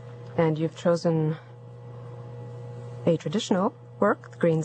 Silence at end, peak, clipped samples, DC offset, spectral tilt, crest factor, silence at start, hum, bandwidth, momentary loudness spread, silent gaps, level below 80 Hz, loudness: 0 s; -6 dBFS; under 0.1%; under 0.1%; -7 dB/octave; 20 dB; 0 s; none; 9 kHz; 17 LU; none; -66 dBFS; -26 LUFS